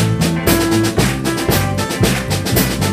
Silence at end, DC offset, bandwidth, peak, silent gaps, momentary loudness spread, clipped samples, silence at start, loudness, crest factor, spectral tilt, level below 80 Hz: 0 s; under 0.1%; 15.5 kHz; 0 dBFS; none; 3 LU; under 0.1%; 0 s; -15 LUFS; 14 dB; -4.5 dB/octave; -30 dBFS